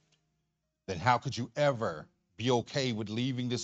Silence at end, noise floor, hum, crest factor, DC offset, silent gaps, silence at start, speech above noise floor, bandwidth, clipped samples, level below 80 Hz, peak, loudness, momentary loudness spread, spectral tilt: 0 s; -82 dBFS; none; 22 dB; under 0.1%; none; 0.9 s; 50 dB; 8.4 kHz; under 0.1%; -68 dBFS; -12 dBFS; -32 LUFS; 10 LU; -5.5 dB/octave